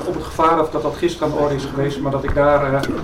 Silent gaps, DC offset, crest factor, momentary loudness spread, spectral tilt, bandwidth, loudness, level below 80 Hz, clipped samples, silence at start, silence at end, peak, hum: none; under 0.1%; 14 dB; 6 LU; -6.5 dB/octave; 16 kHz; -18 LUFS; -34 dBFS; under 0.1%; 0 s; 0 s; -4 dBFS; none